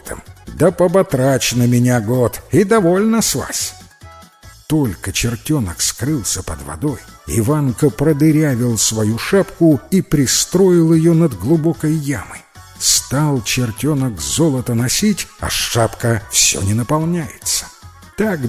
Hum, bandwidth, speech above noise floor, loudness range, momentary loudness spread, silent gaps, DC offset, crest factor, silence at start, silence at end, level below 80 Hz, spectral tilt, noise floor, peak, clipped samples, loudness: none; 16 kHz; 26 dB; 5 LU; 9 LU; none; under 0.1%; 16 dB; 0.05 s; 0 s; -38 dBFS; -4.5 dB/octave; -41 dBFS; 0 dBFS; under 0.1%; -15 LUFS